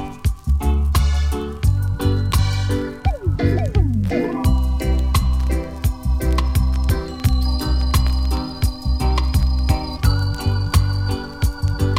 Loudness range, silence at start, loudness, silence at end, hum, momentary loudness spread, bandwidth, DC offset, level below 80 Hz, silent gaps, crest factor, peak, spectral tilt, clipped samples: 1 LU; 0 s; -20 LUFS; 0 s; none; 4 LU; 16 kHz; under 0.1%; -20 dBFS; none; 14 dB; -4 dBFS; -6 dB/octave; under 0.1%